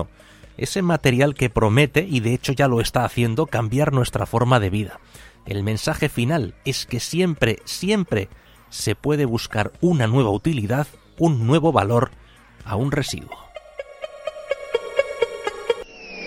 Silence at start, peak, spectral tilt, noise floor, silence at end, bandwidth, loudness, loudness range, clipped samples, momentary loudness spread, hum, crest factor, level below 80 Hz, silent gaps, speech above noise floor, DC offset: 0 s; -2 dBFS; -6 dB/octave; -47 dBFS; 0 s; 16.5 kHz; -21 LUFS; 7 LU; under 0.1%; 15 LU; none; 20 dB; -44 dBFS; none; 27 dB; under 0.1%